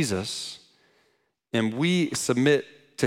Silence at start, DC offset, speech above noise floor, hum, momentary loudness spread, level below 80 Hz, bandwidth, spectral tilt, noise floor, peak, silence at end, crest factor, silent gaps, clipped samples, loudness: 0 s; under 0.1%; 46 dB; none; 15 LU; -66 dBFS; 16.5 kHz; -4.5 dB/octave; -70 dBFS; -8 dBFS; 0 s; 18 dB; none; under 0.1%; -25 LUFS